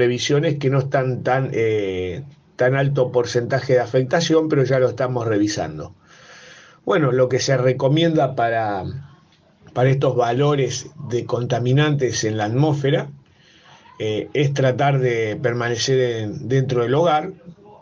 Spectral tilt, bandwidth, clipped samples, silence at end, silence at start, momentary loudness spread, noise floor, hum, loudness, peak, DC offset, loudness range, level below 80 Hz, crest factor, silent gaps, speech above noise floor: -6 dB/octave; 7.6 kHz; under 0.1%; 0.05 s; 0 s; 9 LU; -54 dBFS; none; -20 LUFS; -4 dBFS; under 0.1%; 2 LU; -56 dBFS; 16 dB; none; 35 dB